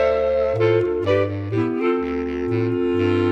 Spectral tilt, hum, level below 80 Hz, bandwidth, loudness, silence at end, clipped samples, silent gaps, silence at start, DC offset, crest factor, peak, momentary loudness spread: -8.5 dB/octave; none; -44 dBFS; 7.4 kHz; -21 LUFS; 0 s; under 0.1%; none; 0 s; under 0.1%; 14 dB; -6 dBFS; 5 LU